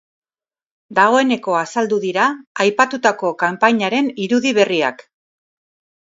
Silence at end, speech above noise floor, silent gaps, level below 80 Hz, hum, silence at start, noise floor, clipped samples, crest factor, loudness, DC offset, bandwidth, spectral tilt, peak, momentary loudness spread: 1 s; over 74 dB; 2.47-2.55 s; -70 dBFS; none; 0.9 s; under -90 dBFS; under 0.1%; 18 dB; -17 LUFS; under 0.1%; 7.8 kHz; -4 dB/octave; 0 dBFS; 5 LU